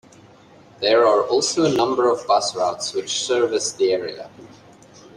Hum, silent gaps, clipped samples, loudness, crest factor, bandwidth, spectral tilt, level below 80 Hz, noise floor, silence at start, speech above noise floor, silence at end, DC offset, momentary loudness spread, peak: none; none; under 0.1%; -19 LUFS; 16 dB; 12 kHz; -3 dB/octave; -64 dBFS; -48 dBFS; 0.8 s; 29 dB; 0.65 s; under 0.1%; 9 LU; -4 dBFS